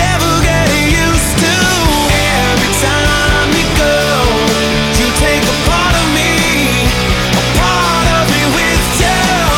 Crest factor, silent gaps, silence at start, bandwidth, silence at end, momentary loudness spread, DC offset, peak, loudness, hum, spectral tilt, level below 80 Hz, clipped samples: 8 dB; none; 0 s; 19 kHz; 0 s; 1 LU; under 0.1%; -2 dBFS; -10 LUFS; none; -3.5 dB/octave; -20 dBFS; under 0.1%